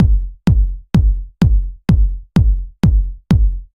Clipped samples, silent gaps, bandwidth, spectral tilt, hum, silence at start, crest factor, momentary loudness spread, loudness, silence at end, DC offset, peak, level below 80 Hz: under 0.1%; none; 6.8 kHz; -8.5 dB/octave; none; 0 s; 12 dB; 3 LU; -17 LUFS; 0.1 s; under 0.1%; -2 dBFS; -16 dBFS